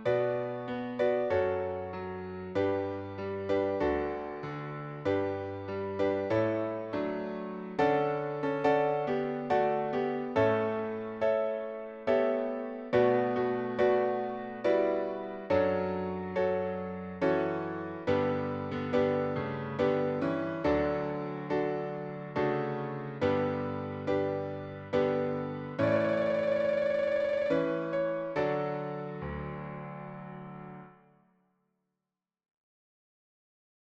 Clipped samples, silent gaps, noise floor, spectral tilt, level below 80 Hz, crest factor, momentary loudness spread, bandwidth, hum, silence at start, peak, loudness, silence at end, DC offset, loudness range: under 0.1%; none; -90 dBFS; -8 dB/octave; -60 dBFS; 18 dB; 10 LU; 7.2 kHz; none; 0 s; -12 dBFS; -31 LUFS; 3 s; under 0.1%; 4 LU